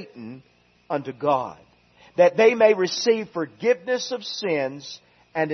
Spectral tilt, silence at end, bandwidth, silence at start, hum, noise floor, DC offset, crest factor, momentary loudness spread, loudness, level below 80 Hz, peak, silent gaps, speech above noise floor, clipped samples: -4 dB/octave; 0 s; 6.4 kHz; 0 s; none; -54 dBFS; under 0.1%; 20 dB; 22 LU; -22 LUFS; -72 dBFS; -4 dBFS; none; 32 dB; under 0.1%